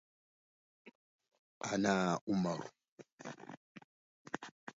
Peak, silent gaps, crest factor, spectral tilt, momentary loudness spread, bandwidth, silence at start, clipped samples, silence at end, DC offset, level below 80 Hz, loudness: -20 dBFS; 0.95-1.19 s, 1.38-1.61 s, 2.21-2.27 s, 2.88-2.98 s, 3.12-3.18 s, 3.57-3.75 s, 3.84-4.25 s, 4.51-4.67 s; 22 dB; -5 dB/octave; 20 LU; 7.6 kHz; 0.85 s; under 0.1%; 0.05 s; under 0.1%; -76 dBFS; -37 LUFS